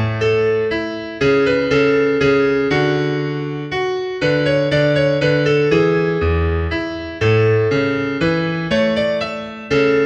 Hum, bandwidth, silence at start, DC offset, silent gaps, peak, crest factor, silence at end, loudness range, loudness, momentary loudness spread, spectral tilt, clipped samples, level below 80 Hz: none; 8.2 kHz; 0 s; under 0.1%; none; -2 dBFS; 14 dB; 0 s; 1 LU; -17 LUFS; 7 LU; -7 dB/octave; under 0.1%; -36 dBFS